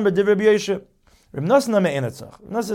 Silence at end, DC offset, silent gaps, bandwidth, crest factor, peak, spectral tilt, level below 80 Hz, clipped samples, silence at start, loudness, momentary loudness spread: 0 s; under 0.1%; none; 16 kHz; 16 dB; -4 dBFS; -6 dB/octave; -58 dBFS; under 0.1%; 0 s; -20 LUFS; 13 LU